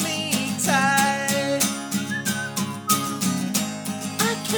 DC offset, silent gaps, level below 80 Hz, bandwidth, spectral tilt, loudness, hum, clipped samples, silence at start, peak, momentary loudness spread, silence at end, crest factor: under 0.1%; none; -64 dBFS; over 20 kHz; -3 dB/octave; -23 LUFS; none; under 0.1%; 0 s; -2 dBFS; 8 LU; 0 s; 22 dB